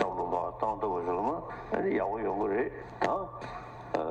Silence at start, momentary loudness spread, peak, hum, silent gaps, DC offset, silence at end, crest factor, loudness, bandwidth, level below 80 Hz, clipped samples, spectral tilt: 0 s; 8 LU; -14 dBFS; none; none; under 0.1%; 0 s; 18 dB; -33 LUFS; 8.6 kHz; -56 dBFS; under 0.1%; -7 dB/octave